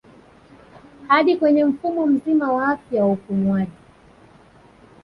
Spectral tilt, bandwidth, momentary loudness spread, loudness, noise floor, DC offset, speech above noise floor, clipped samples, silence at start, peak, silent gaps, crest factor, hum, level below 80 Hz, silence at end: -8.5 dB/octave; 5.6 kHz; 5 LU; -19 LUFS; -50 dBFS; under 0.1%; 31 dB; under 0.1%; 1 s; -4 dBFS; none; 18 dB; none; -58 dBFS; 1.35 s